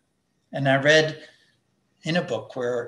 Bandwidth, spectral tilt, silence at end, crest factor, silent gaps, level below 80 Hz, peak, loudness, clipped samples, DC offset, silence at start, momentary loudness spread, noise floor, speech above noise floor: 11.5 kHz; -4.5 dB/octave; 0 s; 20 dB; none; -72 dBFS; -4 dBFS; -22 LUFS; under 0.1%; under 0.1%; 0.5 s; 18 LU; -72 dBFS; 49 dB